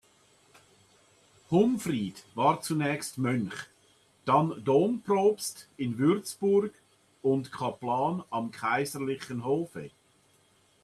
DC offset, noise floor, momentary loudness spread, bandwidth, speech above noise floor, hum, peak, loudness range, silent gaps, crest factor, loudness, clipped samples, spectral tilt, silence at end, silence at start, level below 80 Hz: under 0.1%; -65 dBFS; 11 LU; 14 kHz; 37 dB; none; -12 dBFS; 4 LU; none; 18 dB; -29 LUFS; under 0.1%; -6 dB/octave; 0.95 s; 1.5 s; -70 dBFS